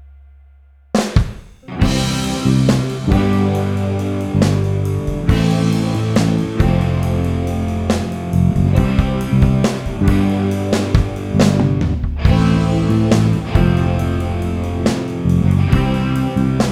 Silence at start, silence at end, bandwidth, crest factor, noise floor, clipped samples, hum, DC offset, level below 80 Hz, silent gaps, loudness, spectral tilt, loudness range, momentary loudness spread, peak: 0 s; 0 s; 15 kHz; 14 dB; -46 dBFS; under 0.1%; none; under 0.1%; -24 dBFS; none; -16 LUFS; -7 dB/octave; 2 LU; 6 LU; 0 dBFS